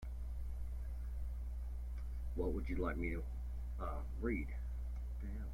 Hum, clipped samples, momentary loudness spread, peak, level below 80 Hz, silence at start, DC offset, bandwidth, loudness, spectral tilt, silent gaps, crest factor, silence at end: 60 Hz at -45 dBFS; under 0.1%; 6 LU; -26 dBFS; -42 dBFS; 0 s; under 0.1%; 5 kHz; -44 LUFS; -8.5 dB/octave; none; 16 dB; 0 s